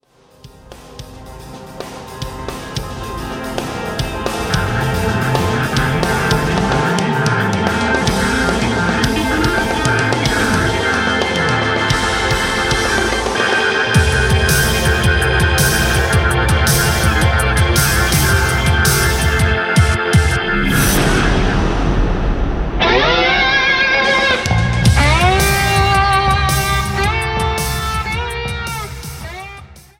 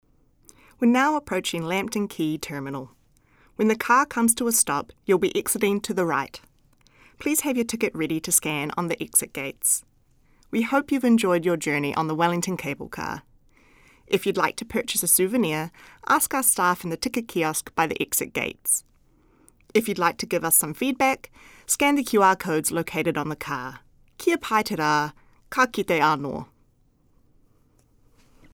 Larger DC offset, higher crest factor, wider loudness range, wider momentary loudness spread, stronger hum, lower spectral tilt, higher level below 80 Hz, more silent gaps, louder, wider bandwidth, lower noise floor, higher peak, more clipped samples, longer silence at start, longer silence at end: neither; second, 16 dB vs 22 dB; first, 7 LU vs 4 LU; about the same, 13 LU vs 12 LU; neither; about the same, -4 dB/octave vs -3.5 dB/octave; first, -22 dBFS vs -58 dBFS; neither; first, -14 LUFS vs -23 LUFS; second, 16.5 kHz vs over 20 kHz; second, -43 dBFS vs -62 dBFS; first, 0 dBFS vs -4 dBFS; neither; second, 0.45 s vs 0.8 s; second, 0.2 s vs 2.1 s